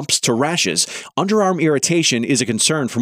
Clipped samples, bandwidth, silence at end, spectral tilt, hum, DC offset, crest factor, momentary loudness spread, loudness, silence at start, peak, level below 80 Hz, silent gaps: under 0.1%; 16 kHz; 0 s; -3 dB/octave; none; under 0.1%; 14 dB; 4 LU; -16 LUFS; 0 s; -2 dBFS; -62 dBFS; none